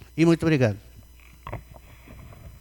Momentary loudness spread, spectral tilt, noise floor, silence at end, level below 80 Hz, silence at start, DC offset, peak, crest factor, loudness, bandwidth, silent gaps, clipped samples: 25 LU; -7.5 dB/octave; -49 dBFS; 0.1 s; -48 dBFS; 0.15 s; under 0.1%; -8 dBFS; 18 dB; -22 LUFS; 18.5 kHz; none; under 0.1%